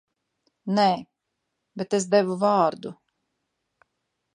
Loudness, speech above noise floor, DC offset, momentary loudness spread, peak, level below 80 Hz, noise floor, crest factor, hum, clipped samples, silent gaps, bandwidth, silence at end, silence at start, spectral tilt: -23 LUFS; 58 dB; under 0.1%; 18 LU; -6 dBFS; -76 dBFS; -80 dBFS; 20 dB; none; under 0.1%; none; 11 kHz; 1.4 s; 0.65 s; -5 dB/octave